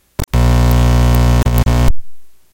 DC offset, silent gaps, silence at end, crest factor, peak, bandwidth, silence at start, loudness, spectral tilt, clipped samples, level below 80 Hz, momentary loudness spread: under 0.1%; none; 0.15 s; 12 dB; 0 dBFS; 17.5 kHz; 0.2 s; -13 LUFS; -6.5 dB/octave; under 0.1%; -14 dBFS; 7 LU